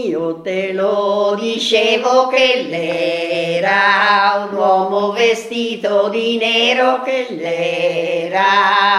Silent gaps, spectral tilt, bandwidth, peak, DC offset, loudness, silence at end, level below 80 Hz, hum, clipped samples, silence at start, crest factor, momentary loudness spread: none; -3.5 dB/octave; 12.5 kHz; 0 dBFS; under 0.1%; -15 LUFS; 0 s; -68 dBFS; none; under 0.1%; 0 s; 14 dB; 8 LU